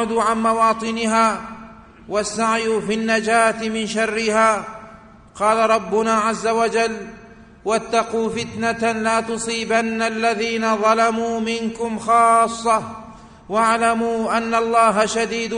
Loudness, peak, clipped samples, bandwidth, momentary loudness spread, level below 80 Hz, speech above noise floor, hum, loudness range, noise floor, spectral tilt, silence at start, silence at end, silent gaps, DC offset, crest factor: -19 LUFS; -4 dBFS; under 0.1%; 10.5 kHz; 9 LU; -52 dBFS; 25 dB; none; 3 LU; -43 dBFS; -3.5 dB/octave; 0 s; 0 s; none; under 0.1%; 16 dB